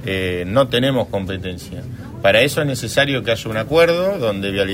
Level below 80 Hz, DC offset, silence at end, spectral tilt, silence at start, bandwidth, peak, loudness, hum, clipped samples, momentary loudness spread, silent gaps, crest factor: -44 dBFS; under 0.1%; 0 s; -5 dB/octave; 0 s; 16 kHz; 0 dBFS; -18 LUFS; none; under 0.1%; 14 LU; none; 18 dB